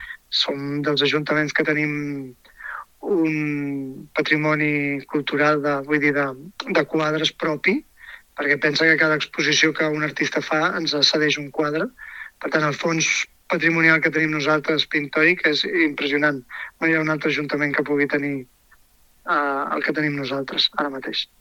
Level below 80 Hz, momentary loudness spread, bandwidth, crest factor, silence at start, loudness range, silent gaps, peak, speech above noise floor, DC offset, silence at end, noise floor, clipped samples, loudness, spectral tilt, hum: -62 dBFS; 11 LU; 16 kHz; 22 dB; 0 s; 5 LU; none; 0 dBFS; 35 dB; under 0.1%; 0.15 s; -56 dBFS; under 0.1%; -20 LUFS; -4 dB/octave; none